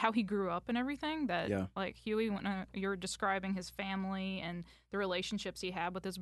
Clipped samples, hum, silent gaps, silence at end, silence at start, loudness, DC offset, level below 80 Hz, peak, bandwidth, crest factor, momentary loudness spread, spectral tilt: under 0.1%; none; none; 0 s; 0 s; -37 LUFS; under 0.1%; -62 dBFS; -16 dBFS; 12 kHz; 22 dB; 5 LU; -5 dB/octave